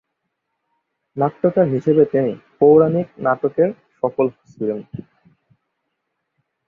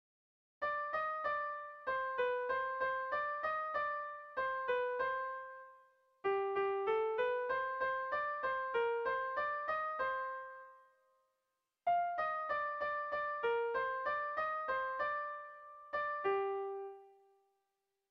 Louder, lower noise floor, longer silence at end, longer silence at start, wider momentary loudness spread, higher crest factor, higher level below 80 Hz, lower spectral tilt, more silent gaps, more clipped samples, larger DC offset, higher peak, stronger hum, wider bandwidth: first, -18 LUFS vs -38 LUFS; second, -76 dBFS vs -87 dBFS; first, 1.65 s vs 1 s; first, 1.15 s vs 0.6 s; first, 13 LU vs 8 LU; about the same, 18 dB vs 14 dB; first, -60 dBFS vs -74 dBFS; first, -10.5 dB/octave vs -5.5 dB/octave; neither; neither; neither; first, -2 dBFS vs -24 dBFS; neither; second, 3.4 kHz vs 6.2 kHz